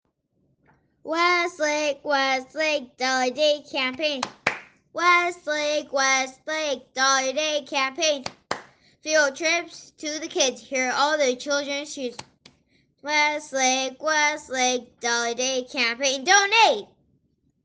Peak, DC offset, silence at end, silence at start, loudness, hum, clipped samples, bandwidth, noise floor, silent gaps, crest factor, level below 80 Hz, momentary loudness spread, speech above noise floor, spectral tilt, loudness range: -6 dBFS; under 0.1%; 0.8 s; 1.05 s; -23 LUFS; none; under 0.1%; 10.5 kHz; -69 dBFS; none; 20 dB; -72 dBFS; 12 LU; 46 dB; 0 dB/octave; 3 LU